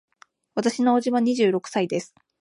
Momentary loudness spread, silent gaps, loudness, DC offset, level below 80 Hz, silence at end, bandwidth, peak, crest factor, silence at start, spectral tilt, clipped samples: 8 LU; none; -23 LUFS; under 0.1%; -76 dBFS; 0.35 s; 11 kHz; -8 dBFS; 14 dB; 0.55 s; -5 dB/octave; under 0.1%